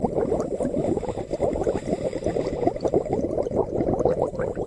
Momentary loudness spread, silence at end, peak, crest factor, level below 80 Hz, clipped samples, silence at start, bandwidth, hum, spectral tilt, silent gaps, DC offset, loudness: 4 LU; 0 s; -4 dBFS; 20 dB; -42 dBFS; under 0.1%; 0 s; 11.5 kHz; none; -8 dB/octave; none; under 0.1%; -25 LUFS